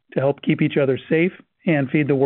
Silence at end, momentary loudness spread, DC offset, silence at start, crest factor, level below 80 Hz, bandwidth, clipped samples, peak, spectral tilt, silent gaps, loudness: 0 s; 3 LU; under 0.1%; 0.15 s; 14 dB; -64 dBFS; 4.1 kHz; under 0.1%; -6 dBFS; -6.5 dB/octave; none; -21 LUFS